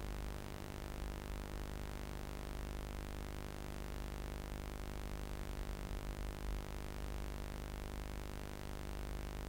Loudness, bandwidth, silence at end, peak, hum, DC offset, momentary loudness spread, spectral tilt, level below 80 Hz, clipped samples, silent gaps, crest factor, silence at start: -47 LUFS; 16.5 kHz; 0 s; -28 dBFS; none; under 0.1%; 1 LU; -5.5 dB/octave; -46 dBFS; under 0.1%; none; 16 dB; 0 s